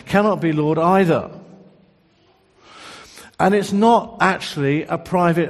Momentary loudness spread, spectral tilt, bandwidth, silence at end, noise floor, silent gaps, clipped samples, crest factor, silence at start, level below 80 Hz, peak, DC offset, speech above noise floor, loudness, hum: 21 LU; -6.5 dB/octave; 13 kHz; 0 s; -57 dBFS; none; under 0.1%; 20 dB; 0.05 s; -54 dBFS; 0 dBFS; under 0.1%; 40 dB; -18 LUFS; none